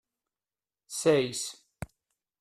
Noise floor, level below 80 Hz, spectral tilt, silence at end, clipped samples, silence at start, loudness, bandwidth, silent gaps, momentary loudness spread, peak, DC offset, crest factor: under -90 dBFS; -62 dBFS; -4 dB/octave; 0.55 s; under 0.1%; 0.9 s; -29 LUFS; 14.5 kHz; none; 20 LU; -10 dBFS; under 0.1%; 22 dB